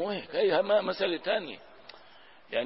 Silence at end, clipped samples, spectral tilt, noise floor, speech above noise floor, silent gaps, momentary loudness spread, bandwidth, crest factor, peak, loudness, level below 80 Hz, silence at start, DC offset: 0 s; under 0.1%; -8 dB/octave; -56 dBFS; 27 dB; none; 13 LU; 5.8 kHz; 16 dB; -14 dBFS; -29 LUFS; -74 dBFS; 0 s; 0.1%